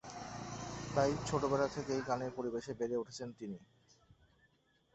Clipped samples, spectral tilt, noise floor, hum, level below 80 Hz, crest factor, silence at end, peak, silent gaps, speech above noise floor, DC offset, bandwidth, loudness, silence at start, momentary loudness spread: under 0.1%; -5.5 dB/octave; -73 dBFS; none; -62 dBFS; 22 dB; 1.3 s; -18 dBFS; none; 36 dB; under 0.1%; 8 kHz; -38 LUFS; 0.05 s; 12 LU